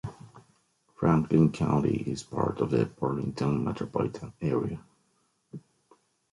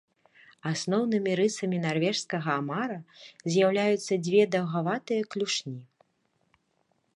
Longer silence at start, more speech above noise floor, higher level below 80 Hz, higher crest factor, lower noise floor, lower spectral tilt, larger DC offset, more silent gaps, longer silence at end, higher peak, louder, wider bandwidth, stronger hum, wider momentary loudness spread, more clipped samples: second, 0.05 s vs 0.65 s; about the same, 44 dB vs 46 dB; first, -54 dBFS vs -76 dBFS; about the same, 20 dB vs 18 dB; about the same, -72 dBFS vs -73 dBFS; first, -8 dB/octave vs -5 dB/octave; neither; neither; second, 0.75 s vs 1.3 s; about the same, -10 dBFS vs -10 dBFS; about the same, -28 LUFS vs -28 LUFS; about the same, 11.5 kHz vs 11.5 kHz; neither; first, 19 LU vs 13 LU; neither